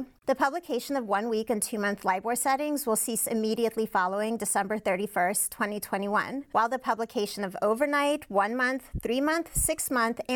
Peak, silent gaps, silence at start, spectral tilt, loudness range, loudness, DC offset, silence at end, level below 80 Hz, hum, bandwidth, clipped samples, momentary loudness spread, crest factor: -12 dBFS; none; 0 s; -3 dB/octave; 1 LU; -28 LUFS; under 0.1%; 0 s; -50 dBFS; none; over 20 kHz; under 0.1%; 5 LU; 16 dB